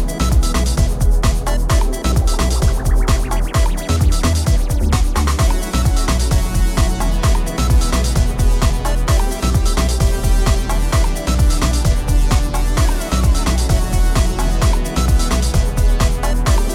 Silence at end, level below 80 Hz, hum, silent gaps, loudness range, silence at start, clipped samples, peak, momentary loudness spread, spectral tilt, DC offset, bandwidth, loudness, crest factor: 0 s; -14 dBFS; none; none; 0 LU; 0 s; under 0.1%; -2 dBFS; 2 LU; -5 dB/octave; under 0.1%; 16 kHz; -17 LUFS; 12 dB